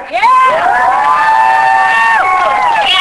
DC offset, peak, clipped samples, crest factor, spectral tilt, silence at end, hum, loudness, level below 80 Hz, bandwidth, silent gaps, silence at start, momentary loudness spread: under 0.1%; 0 dBFS; under 0.1%; 8 dB; -1 dB/octave; 0 s; none; -8 LUFS; -46 dBFS; 11 kHz; none; 0 s; 2 LU